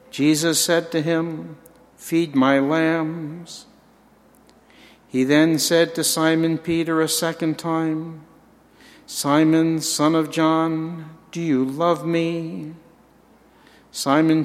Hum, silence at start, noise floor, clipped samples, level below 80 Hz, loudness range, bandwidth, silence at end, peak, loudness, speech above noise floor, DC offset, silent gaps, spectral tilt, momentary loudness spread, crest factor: none; 0.15 s; -54 dBFS; under 0.1%; -64 dBFS; 4 LU; 16 kHz; 0 s; -2 dBFS; -20 LUFS; 34 dB; under 0.1%; none; -4.5 dB/octave; 17 LU; 20 dB